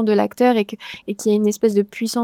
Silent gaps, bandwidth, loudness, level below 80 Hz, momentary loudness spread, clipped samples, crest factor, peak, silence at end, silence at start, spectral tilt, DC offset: none; 16.5 kHz; -19 LUFS; -64 dBFS; 11 LU; under 0.1%; 16 dB; -4 dBFS; 0 s; 0 s; -5.5 dB/octave; under 0.1%